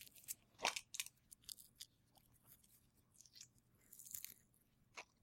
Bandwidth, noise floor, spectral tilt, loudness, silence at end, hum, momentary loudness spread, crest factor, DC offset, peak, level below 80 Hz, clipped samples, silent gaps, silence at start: 16.5 kHz; -76 dBFS; 0.5 dB/octave; -50 LUFS; 0.2 s; none; 24 LU; 32 dB; under 0.1%; -22 dBFS; -84 dBFS; under 0.1%; none; 0 s